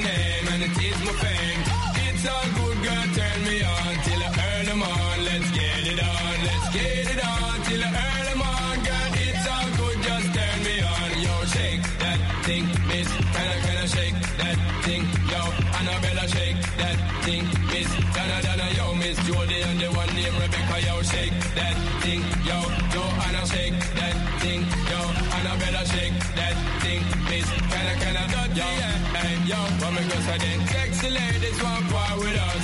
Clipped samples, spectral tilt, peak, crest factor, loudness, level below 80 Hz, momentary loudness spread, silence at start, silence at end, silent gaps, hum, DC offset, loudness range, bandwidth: under 0.1%; -4.5 dB/octave; -10 dBFS; 14 dB; -24 LUFS; -32 dBFS; 1 LU; 0 s; 0 s; none; none; under 0.1%; 1 LU; 11.5 kHz